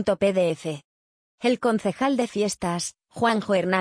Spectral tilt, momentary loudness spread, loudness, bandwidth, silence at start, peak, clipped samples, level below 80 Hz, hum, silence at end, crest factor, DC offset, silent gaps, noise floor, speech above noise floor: -5 dB/octave; 9 LU; -24 LUFS; 10.5 kHz; 0 s; -8 dBFS; under 0.1%; -60 dBFS; none; 0 s; 16 dB; under 0.1%; 0.84-1.38 s; under -90 dBFS; over 67 dB